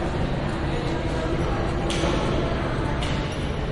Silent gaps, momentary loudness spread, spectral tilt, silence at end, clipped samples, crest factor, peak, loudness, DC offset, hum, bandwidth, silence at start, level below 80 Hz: none; 3 LU; -6 dB/octave; 0 s; under 0.1%; 14 dB; -10 dBFS; -26 LUFS; under 0.1%; none; 11.5 kHz; 0 s; -30 dBFS